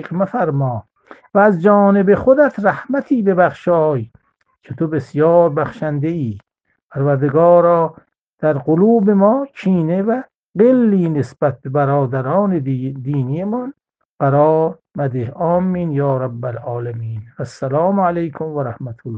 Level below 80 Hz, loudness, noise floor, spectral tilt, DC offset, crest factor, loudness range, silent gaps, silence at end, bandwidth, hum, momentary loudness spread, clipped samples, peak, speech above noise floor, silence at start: -54 dBFS; -16 LUFS; -51 dBFS; -10 dB/octave; under 0.1%; 16 dB; 5 LU; 6.83-6.89 s, 8.21-8.38 s, 10.36-10.53 s, 14.05-14.18 s; 0 s; 7.8 kHz; none; 13 LU; under 0.1%; 0 dBFS; 36 dB; 0 s